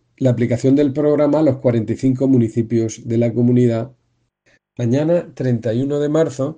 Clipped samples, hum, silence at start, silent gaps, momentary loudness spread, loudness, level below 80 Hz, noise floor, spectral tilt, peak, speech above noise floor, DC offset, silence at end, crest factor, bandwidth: under 0.1%; none; 0.2 s; none; 5 LU; -17 LUFS; -54 dBFS; -66 dBFS; -8.5 dB/octave; -4 dBFS; 49 dB; under 0.1%; 0.05 s; 14 dB; 9.2 kHz